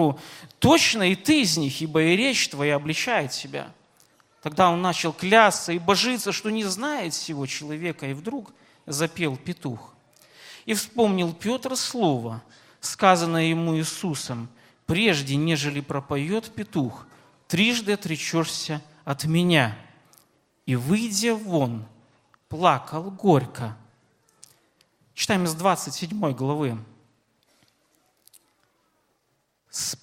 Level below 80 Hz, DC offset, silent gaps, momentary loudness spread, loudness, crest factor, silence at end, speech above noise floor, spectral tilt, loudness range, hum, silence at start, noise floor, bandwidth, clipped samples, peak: -62 dBFS; under 0.1%; none; 15 LU; -24 LUFS; 24 dB; 0.05 s; 48 dB; -4 dB/octave; 7 LU; none; 0 s; -72 dBFS; 16.5 kHz; under 0.1%; 0 dBFS